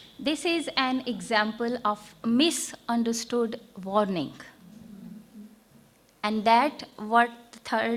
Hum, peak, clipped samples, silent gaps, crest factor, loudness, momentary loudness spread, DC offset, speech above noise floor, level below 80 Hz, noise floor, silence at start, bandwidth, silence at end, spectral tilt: none; -6 dBFS; under 0.1%; none; 22 dB; -27 LUFS; 22 LU; under 0.1%; 32 dB; -68 dBFS; -58 dBFS; 0 s; 16 kHz; 0 s; -3.5 dB/octave